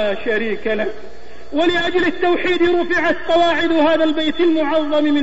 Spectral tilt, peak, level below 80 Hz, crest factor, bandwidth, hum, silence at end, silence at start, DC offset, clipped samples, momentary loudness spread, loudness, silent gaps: -5 dB/octave; -6 dBFS; -46 dBFS; 12 dB; 8 kHz; none; 0 s; 0 s; 5%; under 0.1%; 6 LU; -17 LUFS; none